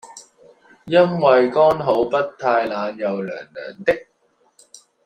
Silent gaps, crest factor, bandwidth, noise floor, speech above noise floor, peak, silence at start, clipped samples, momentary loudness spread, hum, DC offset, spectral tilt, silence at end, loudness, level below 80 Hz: none; 18 dB; 9.8 kHz; -62 dBFS; 44 dB; -2 dBFS; 0.05 s; under 0.1%; 12 LU; none; under 0.1%; -6 dB/octave; 1.05 s; -19 LUFS; -60 dBFS